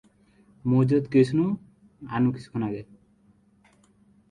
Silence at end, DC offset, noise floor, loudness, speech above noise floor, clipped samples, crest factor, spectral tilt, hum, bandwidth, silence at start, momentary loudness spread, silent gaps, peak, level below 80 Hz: 1.45 s; under 0.1%; -61 dBFS; -25 LUFS; 38 dB; under 0.1%; 18 dB; -9 dB/octave; none; 10 kHz; 0.65 s; 13 LU; none; -8 dBFS; -60 dBFS